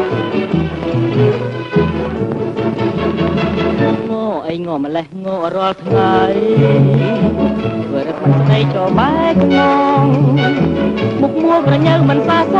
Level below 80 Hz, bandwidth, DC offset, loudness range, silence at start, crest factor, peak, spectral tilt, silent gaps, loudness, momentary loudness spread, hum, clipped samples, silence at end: -38 dBFS; 6.8 kHz; under 0.1%; 5 LU; 0 s; 12 dB; -2 dBFS; -8.5 dB/octave; none; -14 LUFS; 8 LU; none; under 0.1%; 0 s